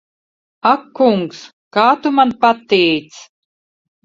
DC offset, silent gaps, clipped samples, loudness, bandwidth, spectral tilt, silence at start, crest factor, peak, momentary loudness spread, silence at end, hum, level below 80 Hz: under 0.1%; 1.53-1.71 s; under 0.1%; -15 LUFS; 7.8 kHz; -5.5 dB/octave; 0.65 s; 16 dB; 0 dBFS; 8 LU; 0.8 s; none; -62 dBFS